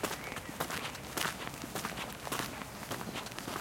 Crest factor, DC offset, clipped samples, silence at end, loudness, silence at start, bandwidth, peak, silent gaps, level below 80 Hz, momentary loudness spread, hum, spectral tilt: 26 dB; under 0.1%; under 0.1%; 0 s; -39 LUFS; 0 s; 17 kHz; -14 dBFS; none; -60 dBFS; 5 LU; none; -3 dB/octave